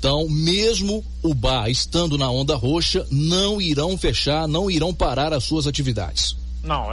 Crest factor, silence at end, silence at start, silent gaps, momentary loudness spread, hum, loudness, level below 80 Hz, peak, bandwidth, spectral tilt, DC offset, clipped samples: 12 dB; 0 s; 0 s; none; 5 LU; none; -21 LUFS; -30 dBFS; -8 dBFS; 11.5 kHz; -4.5 dB/octave; under 0.1%; under 0.1%